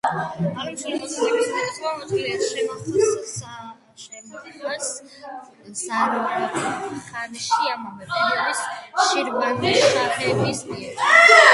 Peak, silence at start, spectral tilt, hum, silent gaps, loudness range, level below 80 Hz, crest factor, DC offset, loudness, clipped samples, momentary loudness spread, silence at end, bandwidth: 0 dBFS; 0.05 s; -3 dB/octave; none; none; 7 LU; -62 dBFS; 22 dB; under 0.1%; -21 LUFS; under 0.1%; 20 LU; 0 s; 11.5 kHz